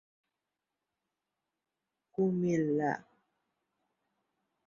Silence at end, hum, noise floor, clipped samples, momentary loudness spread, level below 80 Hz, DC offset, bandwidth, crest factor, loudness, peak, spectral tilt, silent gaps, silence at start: 1.65 s; none; -89 dBFS; under 0.1%; 11 LU; -76 dBFS; under 0.1%; 7.2 kHz; 20 dB; -32 LUFS; -18 dBFS; -8.5 dB/octave; none; 2.2 s